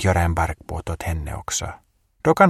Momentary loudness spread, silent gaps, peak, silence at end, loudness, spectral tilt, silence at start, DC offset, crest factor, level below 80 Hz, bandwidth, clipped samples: 11 LU; none; 0 dBFS; 0 s; -25 LUFS; -5 dB/octave; 0 s; under 0.1%; 20 dB; -34 dBFS; 15.5 kHz; under 0.1%